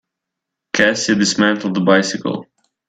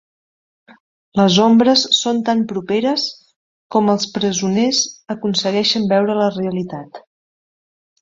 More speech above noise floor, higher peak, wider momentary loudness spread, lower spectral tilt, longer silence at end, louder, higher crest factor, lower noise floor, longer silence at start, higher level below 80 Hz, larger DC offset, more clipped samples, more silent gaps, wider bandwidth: second, 65 dB vs over 74 dB; about the same, 0 dBFS vs -2 dBFS; about the same, 9 LU vs 11 LU; about the same, -4 dB/octave vs -4 dB/octave; second, 0.45 s vs 1 s; about the same, -16 LUFS vs -16 LUFS; about the same, 18 dB vs 16 dB; second, -81 dBFS vs under -90 dBFS; second, 0.75 s vs 1.15 s; about the same, -58 dBFS vs -60 dBFS; neither; neither; second, none vs 3.36-3.70 s; first, 9.2 kHz vs 7.8 kHz